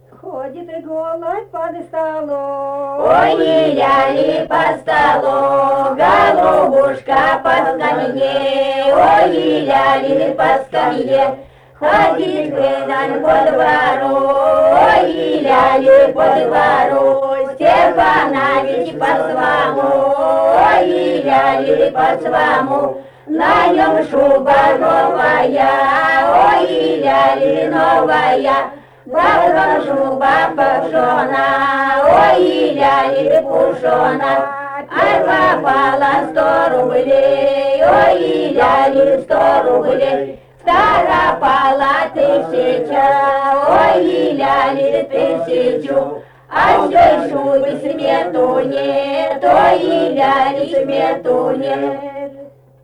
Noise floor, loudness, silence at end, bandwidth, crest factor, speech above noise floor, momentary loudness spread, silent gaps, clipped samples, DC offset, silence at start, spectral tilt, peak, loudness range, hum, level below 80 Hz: -38 dBFS; -13 LUFS; 0.35 s; 10.5 kHz; 12 dB; 25 dB; 8 LU; none; under 0.1%; under 0.1%; 0.25 s; -5.5 dB/octave; -2 dBFS; 3 LU; none; -46 dBFS